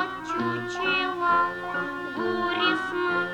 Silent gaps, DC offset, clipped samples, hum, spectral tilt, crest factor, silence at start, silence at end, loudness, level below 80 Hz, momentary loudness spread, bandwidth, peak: none; under 0.1%; under 0.1%; none; -4.5 dB/octave; 16 dB; 0 s; 0 s; -26 LUFS; -62 dBFS; 7 LU; 16.5 kHz; -10 dBFS